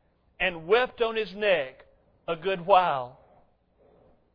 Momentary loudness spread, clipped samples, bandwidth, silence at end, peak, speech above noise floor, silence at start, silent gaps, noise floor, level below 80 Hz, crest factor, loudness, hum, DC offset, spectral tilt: 14 LU; under 0.1%; 5.2 kHz; 1.2 s; -6 dBFS; 37 dB; 0.4 s; none; -63 dBFS; -58 dBFS; 22 dB; -26 LUFS; none; under 0.1%; -6.5 dB/octave